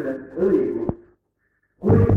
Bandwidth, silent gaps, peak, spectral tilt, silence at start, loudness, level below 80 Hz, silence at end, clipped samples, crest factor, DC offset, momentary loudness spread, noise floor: 3.2 kHz; none; -4 dBFS; -11.5 dB/octave; 0 s; -22 LUFS; -38 dBFS; 0 s; under 0.1%; 18 dB; under 0.1%; 11 LU; -70 dBFS